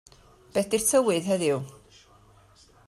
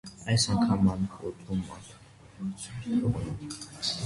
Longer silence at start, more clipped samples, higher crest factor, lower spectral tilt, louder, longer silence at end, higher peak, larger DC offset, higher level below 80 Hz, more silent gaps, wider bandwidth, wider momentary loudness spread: first, 0.55 s vs 0.05 s; neither; about the same, 18 dB vs 16 dB; about the same, -4 dB/octave vs -5 dB/octave; first, -25 LUFS vs -30 LUFS; first, 1.15 s vs 0 s; first, -10 dBFS vs -14 dBFS; neither; second, -62 dBFS vs -50 dBFS; neither; first, 16 kHz vs 11.5 kHz; second, 10 LU vs 15 LU